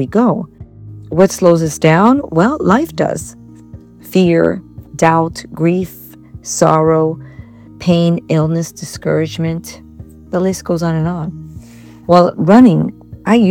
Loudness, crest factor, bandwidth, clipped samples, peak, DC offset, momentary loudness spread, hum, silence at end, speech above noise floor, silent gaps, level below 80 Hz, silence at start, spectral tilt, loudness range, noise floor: -13 LUFS; 14 dB; 17.5 kHz; 0.4%; 0 dBFS; under 0.1%; 17 LU; none; 0 s; 24 dB; none; -44 dBFS; 0 s; -6.5 dB/octave; 4 LU; -37 dBFS